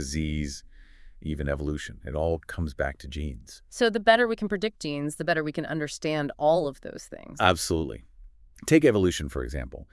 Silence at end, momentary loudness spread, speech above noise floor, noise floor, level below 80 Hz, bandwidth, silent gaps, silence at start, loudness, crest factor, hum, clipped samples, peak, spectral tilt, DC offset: 0.1 s; 17 LU; 23 dB; -50 dBFS; -42 dBFS; 12 kHz; none; 0 s; -27 LUFS; 22 dB; none; under 0.1%; -4 dBFS; -5 dB/octave; under 0.1%